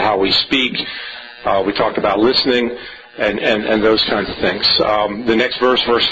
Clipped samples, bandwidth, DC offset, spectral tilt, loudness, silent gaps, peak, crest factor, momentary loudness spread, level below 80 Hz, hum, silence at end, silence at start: under 0.1%; 8 kHz; under 0.1%; -5 dB/octave; -15 LUFS; none; -4 dBFS; 12 dB; 10 LU; -44 dBFS; none; 0 s; 0 s